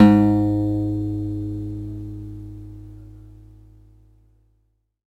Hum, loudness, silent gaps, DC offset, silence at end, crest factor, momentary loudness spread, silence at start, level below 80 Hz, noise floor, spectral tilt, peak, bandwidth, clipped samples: 50 Hz at -45 dBFS; -22 LUFS; none; under 0.1%; 1.8 s; 22 dB; 24 LU; 0 s; -42 dBFS; -67 dBFS; -9.5 dB/octave; 0 dBFS; 8 kHz; under 0.1%